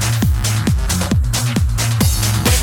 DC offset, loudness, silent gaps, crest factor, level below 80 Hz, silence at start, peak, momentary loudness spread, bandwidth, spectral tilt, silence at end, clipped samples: under 0.1%; -16 LUFS; none; 14 dB; -20 dBFS; 0 s; 0 dBFS; 2 LU; 18.5 kHz; -4 dB/octave; 0 s; under 0.1%